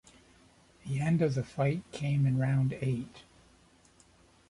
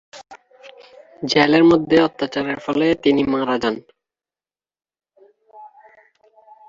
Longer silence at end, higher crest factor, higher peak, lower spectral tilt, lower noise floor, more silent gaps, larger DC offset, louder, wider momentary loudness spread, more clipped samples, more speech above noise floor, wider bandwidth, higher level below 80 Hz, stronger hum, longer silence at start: first, 1.3 s vs 1 s; about the same, 16 dB vs 20 dB; second, -18 dBFS vs 0 dBFS; first, -8 dB/octave vs -5.5 dB/octave; second, -62 dBFS vs under -90 dBFS; neither; neither; second, -31 LUFS vs -17 LUFS; about the same, 9 LU vs 11 LU; neither; second, 33 dB vs over 72 dB; first, 11 kHz vs 7.6 kHz; second, -62 dBFS vs -56 dBFS; neither; first, 0.85 s vs 0.15 s